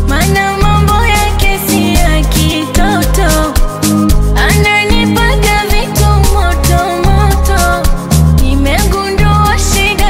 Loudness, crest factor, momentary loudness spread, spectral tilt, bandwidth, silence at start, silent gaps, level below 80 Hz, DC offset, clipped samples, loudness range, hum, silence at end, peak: -10 LUFS; 8 dB; 3 LU; -4.5 dB/octave; 16.5 kHz; 0 s; none; -12 dBFS; under 0.1%; under 0.1%; 1 LU; none; 0 s; 0 dBFS